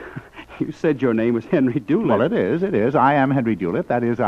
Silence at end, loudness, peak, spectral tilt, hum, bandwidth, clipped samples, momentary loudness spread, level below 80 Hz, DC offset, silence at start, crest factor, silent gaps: 0 s; -19 LUFS; -4 dBFS; -9 dB/octave; none; 7.2 kHz; under 0.1%; 13 LU; -54 dBFS; under 0.1%; 0 s; 16 dB; none